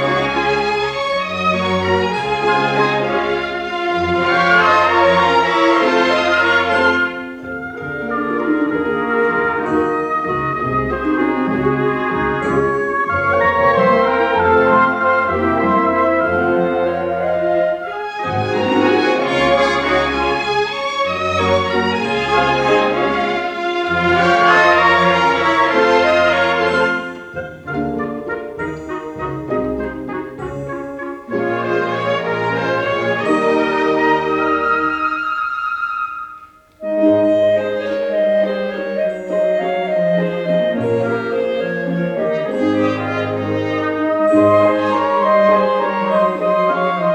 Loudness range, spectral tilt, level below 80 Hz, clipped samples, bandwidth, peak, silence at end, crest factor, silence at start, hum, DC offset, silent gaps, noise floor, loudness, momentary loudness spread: 5 LU; -6 dB/octave; -46 dBFS; under 0.1%; 10.5 kHz; 0 dBFS; 0 s; 16 dB; 0 s; none; under 0.1%; none; -40 dBFS; -16 LUFS; 10 LU